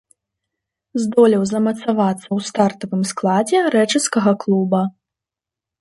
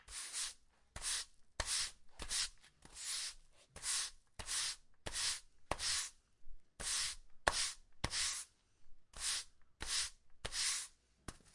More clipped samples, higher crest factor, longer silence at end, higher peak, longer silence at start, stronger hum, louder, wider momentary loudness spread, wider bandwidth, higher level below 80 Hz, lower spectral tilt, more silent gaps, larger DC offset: neither; second, 16 dB vs 34 dB; first, 0.9 s vs 0.15 s; first, -2 dBFS vs -10 dBFS; first, 0.95 s vs 0.05 s; neither; first, -18 LUFS vs -40 LUFS; second, 8 LU vs 14 LU; about the same, 11.5 kHz vs 11.5 kHz; second, -64 dBFS vs -58 dBFS; first, -5 dB/octave vs 0 dB/octave; neither; neither